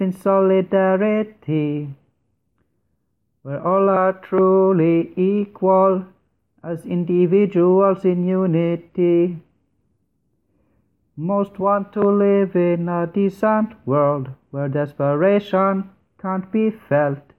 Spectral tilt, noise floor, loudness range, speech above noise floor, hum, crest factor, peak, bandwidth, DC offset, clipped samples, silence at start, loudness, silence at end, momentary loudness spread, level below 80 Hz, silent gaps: -10 dB/octave; -71 dBFS; 5 LU; 53 dB; none; 16 dB; -4 dBFS; 4.2 kHz; under 0.1%; under 0.1%; 0 s; -19 LUFS; 0.2 s; 11 LU; -64 dBFS; none